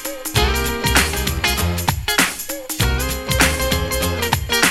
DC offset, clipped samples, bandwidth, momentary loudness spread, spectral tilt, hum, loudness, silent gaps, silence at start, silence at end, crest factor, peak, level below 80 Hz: under 0.1%; under 0.1%; 17.5 kHz; 5 LU; -3 dB/octave; none; -18 LUFS; none; 0 s; 0 s; 18 dB; 0 dBFS; -26 dBFS